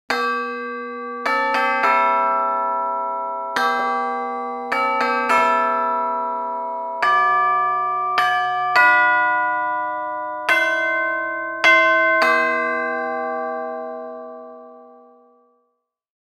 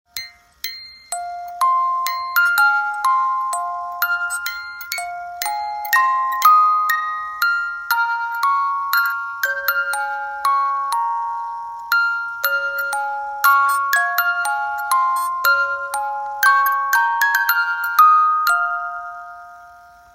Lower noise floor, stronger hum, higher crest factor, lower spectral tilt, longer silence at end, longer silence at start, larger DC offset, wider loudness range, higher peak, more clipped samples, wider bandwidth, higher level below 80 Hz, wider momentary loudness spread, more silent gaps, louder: first, -72 dBFS vs -44 dBFS; neither; about the same, 18 dB vs 18 dB; first, -2.5 dB/octave vs 2.5 dB/octave; first, 1.45 s vs 0.35 s; about the same, 0.1 s vs 0.15 s; neither; about the same, 4 LU vs 5 LU; about the same, -2 dBFS vs -2 dBFS; neither; about the same, 15.5 kHz vs 16 kHz; second, -76 dBFS vs -64 dBFS; about the same, 12 LU vs 14 LU; neither; about the same, -19 LUFS vs -18 LUFS